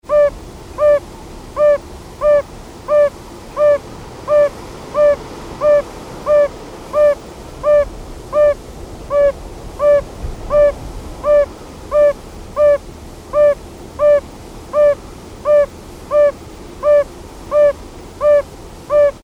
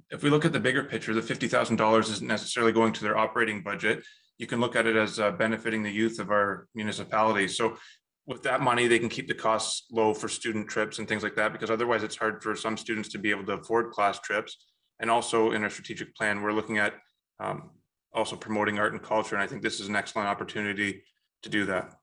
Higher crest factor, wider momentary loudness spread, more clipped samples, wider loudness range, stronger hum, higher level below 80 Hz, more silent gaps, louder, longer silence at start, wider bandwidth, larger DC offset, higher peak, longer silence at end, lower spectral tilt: second, 12 dB vs 22 dB; first, 19 LU vs 9 LU; neither; second, 1 LU vs 4 LU; neither; first, -36 dBFS vs -70 dBFS; neither; first, -15 LUFS vs -28 LUFS; about the same, 0.1 s vs 0.1 s; about the same, 11.5 kHz vs 10.5 kHz; neither; about the same, -4 dBFS vs -6 dBFS; about the same, 0.05 s vs 0.15 s; first, -5.5 dB/octave vs -4 dB/octave